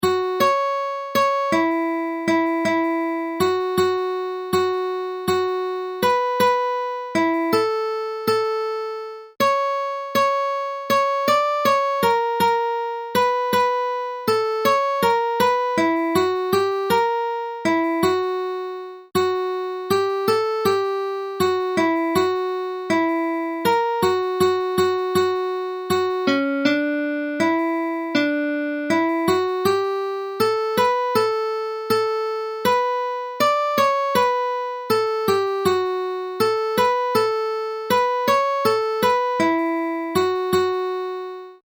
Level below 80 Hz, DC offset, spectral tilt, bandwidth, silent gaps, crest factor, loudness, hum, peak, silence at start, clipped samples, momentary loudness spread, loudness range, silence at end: -64 dBFS; under 0.1%; -4.5 dB/octave; over 20 kHz; none; 16 dB; -21 LUFS; none; -4 dBFS; 0 s; under 0.1%; 6 LU; 2 LU; 0.1 s